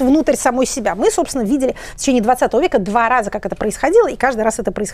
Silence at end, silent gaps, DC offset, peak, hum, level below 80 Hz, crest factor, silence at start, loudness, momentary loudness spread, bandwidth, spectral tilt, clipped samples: 0 s; none; under 0.1%; -2 dBFS; none; -38 dBFS; 14 dB; 0 s; -16 LUFS; 7 LU; 15.5 kHz; -4 dB/octave; under 0.1%